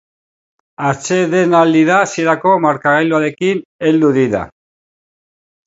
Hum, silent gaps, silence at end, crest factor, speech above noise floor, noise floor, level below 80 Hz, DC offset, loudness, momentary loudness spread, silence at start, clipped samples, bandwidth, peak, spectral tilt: none; 3.65-3.79 s; 1.2 s; 14 dB; over 77 dB; under -90 dBFS; -54 dBFS; under 0.1%; -13 LUFS; 8 LU; 0.8 s; under 0.1%; 8 kHz; 0 dBFS; -5.5 dB/octave